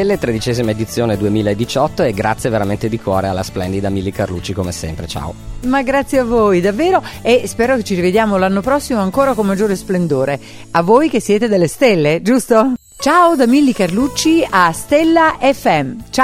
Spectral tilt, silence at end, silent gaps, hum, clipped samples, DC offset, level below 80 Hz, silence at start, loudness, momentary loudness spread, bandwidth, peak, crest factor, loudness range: -5.5 dB/octave; 0 s; none; none; under 0.1%; under 0.1%; -38 dBFS; 0 s; -14 LUFS; 9 LU; 16.5 kHz; 0 dBFS; 14 dB; 6 LU